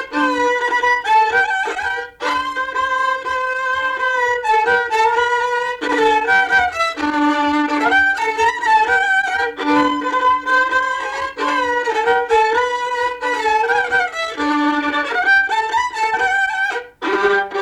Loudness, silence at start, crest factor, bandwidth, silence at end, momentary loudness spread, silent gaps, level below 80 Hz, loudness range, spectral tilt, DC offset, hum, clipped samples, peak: -16 LUFS; 0 s; 12 dB; 13 kHz; 0 s; 6 LU; none; -52 dBFS; 2 LU; -2.5 dB/octave; under 0.1%; none; under 0.1%; -4 dBFS